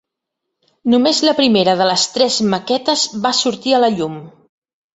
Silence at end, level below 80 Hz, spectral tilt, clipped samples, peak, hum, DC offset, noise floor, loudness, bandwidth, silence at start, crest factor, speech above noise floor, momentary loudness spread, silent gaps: 0.65 s; -60 dBFS; -3.5 dB/octave; under 0.1%; 0 dBFS; none; under 0.1%; -78 dBFS; -15 LUFS; 8.2 kHz; 0.85 s; 16 dB; 63 dB; 7 LU; none